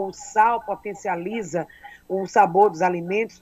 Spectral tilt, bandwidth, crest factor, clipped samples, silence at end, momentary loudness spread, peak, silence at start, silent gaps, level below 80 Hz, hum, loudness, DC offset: -5.5 dB/octave; 12.5 kHz; 18 dB; under 0.1%; 0.15 s; 12 LU; -4 dBFS; 0 s; none; -62 dBFS; none; -22 LUFS; under 0.1%